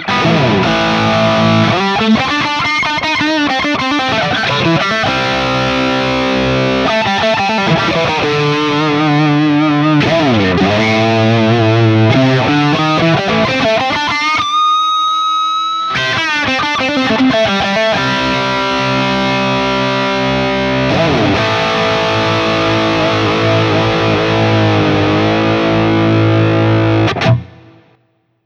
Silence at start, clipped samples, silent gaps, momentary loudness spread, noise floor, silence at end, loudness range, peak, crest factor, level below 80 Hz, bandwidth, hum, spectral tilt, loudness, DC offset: 0 s; under 0.1%; none; 3 LU; -58 dBFS; 1 s; 2 LU; 0 dBFS; 12 dB; -38 dBFS; 9 kHz; none; -5.5 dB/octave; -12 LUFS; under 0.1%